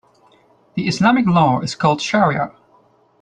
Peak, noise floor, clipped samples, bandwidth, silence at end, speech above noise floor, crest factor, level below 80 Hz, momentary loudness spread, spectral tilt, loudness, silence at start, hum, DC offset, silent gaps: -2 dBFS; -55 dBFS; under 0.1%; 9.8 kHz; 0.7 s; 39 dB; 16 dB; -54 dBFS; 10 LU; -6 dB/octave; -17 LUFS; 0.75 s; none; under 0.1%; none